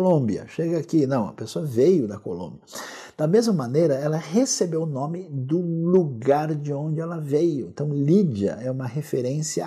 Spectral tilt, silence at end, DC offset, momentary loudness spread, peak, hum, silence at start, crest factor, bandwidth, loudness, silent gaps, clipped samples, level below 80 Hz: -6.5 dB/octave; 0 s; under 0.1%; 10 LU; -8 dBFS; none; 0 s; 16 dB; 14.5 kHz; -23 LUFS; none; under 0.1%; -70 dBFS